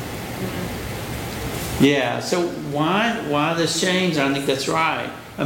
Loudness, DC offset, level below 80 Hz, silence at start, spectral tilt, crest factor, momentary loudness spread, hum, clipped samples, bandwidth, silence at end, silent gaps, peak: -21 LUFS; under 0.1%; -44 dBFS; 0 s; -4.5 dB/octave; 16 dB; 10 LU; none; under 0.1%; 17 kHz; 0 s; none; -6 dBFS